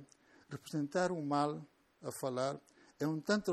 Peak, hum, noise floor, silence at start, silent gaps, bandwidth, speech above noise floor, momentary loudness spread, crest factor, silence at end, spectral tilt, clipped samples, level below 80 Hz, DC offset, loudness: -20 dBFS; none; -63 dBFS; 0 s; none; 14.5 kHz; 27 dB; 15 LU; 20 dB; 0 s; -5.5 dB/octave; under 0.1%; -76 dBFS; under 0.1%; -38 LUFS